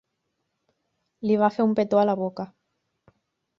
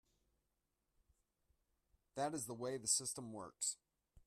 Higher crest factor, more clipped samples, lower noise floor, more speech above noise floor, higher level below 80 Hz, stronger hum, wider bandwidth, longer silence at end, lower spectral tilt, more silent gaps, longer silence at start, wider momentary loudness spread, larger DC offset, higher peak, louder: about the same, 20 dB vs 24 dB; neither; second, -78 dBFS vs -87 dBFS; first, 56 dB vs 44 dB; first, -68 dBFS vs -78 dBFS; neither; second, 7 kHz vs 15.5 kHz; first, 1.15 s vs 0.5 s; first, -8.5 dB/octave vs -2.5 dB/octave; neither; second, 1.2 s vs 2.15 s; about the same, 14 LU vs 15 LU; neither; first, -6 dBFS vs -24 dBFS; first, -23 LUFS vs -41 LUFS